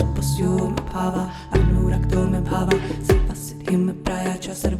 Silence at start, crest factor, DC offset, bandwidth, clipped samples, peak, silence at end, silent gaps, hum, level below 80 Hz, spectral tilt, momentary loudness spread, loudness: 0 s; 16 dB; under 0.1%; 15.5 kHz; under 0.1%; -4 dBFS; 0 s; none; none; -26 dBFS; -6.5 dB/octave; 6 LU; -22 LUFS